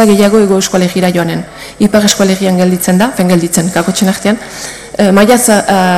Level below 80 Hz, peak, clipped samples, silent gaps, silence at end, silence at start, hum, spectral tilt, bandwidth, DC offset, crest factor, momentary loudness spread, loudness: -42 dBFS; 0 dBFS; under 0.1%; none; 0 s; 0 s; none; -4.5 dB/octave; 16 kHz; under 0.1%; 10 dB; 10 LU; -9 LUFS